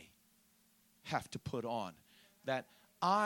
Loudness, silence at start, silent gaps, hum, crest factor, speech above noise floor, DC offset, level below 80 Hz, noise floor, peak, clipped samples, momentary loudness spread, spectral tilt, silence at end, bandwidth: -41 LUFS; 0 s; none; none; 22 dB; 30 dB; under 0.1%; -74 dBFS; -71 dBFS; -18 dBFS; under 0.1%; 22 LU; -5 dB/octave; 0 s; 17.5 kHz